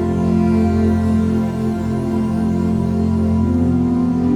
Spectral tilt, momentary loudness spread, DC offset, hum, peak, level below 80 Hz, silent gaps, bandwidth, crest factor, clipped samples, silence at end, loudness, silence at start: -9 dB/octave; 4 LU; under 0.1%; none; -4 dBFS; -32 dBFS; none; 10.5 kHz; 12 dB; under 0.1%; 0 s; -17 LUFS; 0 s